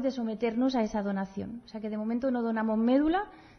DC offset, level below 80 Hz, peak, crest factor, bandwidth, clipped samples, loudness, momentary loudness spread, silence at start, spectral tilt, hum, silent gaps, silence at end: under 0.1%; -58 dBFS; -14 dBFS; 16 dB; 6.6 kHz; under 0.1%; -30 LUFS; 12 LU; 0 s; -7 dB/octave; none; none; 0.15 s